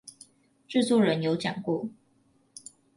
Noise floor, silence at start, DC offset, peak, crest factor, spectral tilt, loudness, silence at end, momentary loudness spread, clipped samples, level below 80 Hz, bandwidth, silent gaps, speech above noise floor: -66 dBFS; 0.05 s; under 0.1%; -12 dBFS; 18 dB; -5.5 dB/octave; -27 LUFS; 1.05 s; 23 LU; under 0.1%; -72 dBFS; 11.5 kHz; none; 40 dB